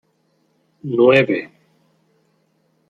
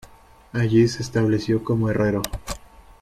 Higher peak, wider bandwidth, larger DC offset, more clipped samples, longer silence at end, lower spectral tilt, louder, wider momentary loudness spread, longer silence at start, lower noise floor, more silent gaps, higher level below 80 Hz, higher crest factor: first, -2 dBFS vs -6 dBFS; second, 7.8 kHz vs 15 kHz; neither; neither; first, 1.45 s vs 0.45 s; about the same, -7.5 dB/octave vs -6.5 dB/octave; first, -16 LUFS vs -22 LUFS; first, 22 LU vs 14 LU; first, 0.85 s vs 0.55 s; first, -64 dBFS vs -48 dBFS; neither; second, -64 dBFS vs -42 dBFS; about the same, 20 dB vs 16 dB